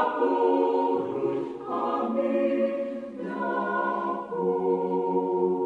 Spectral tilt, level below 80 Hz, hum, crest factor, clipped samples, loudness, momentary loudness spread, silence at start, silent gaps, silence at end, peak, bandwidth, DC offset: -8.5 dB/octave; -72 dBFS; none; 14 dB; under 0.1%; -27 LUFS; 8 LU; 0 s; none; 0 s; -12 dBFS; 4.9 kHz; under 0.1%